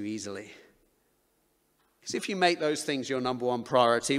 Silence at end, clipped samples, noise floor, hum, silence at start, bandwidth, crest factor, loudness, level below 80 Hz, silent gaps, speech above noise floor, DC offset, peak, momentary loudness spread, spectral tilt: 0 s; under 0.1%; -71 dBFS; none; 0 s; 15.5 kHz; 22 dB; -28 LUFS; -70 dBFS; none; 43 dB; under 0.1%; -8 dBFS; 17 LU; -3.5 dB/octave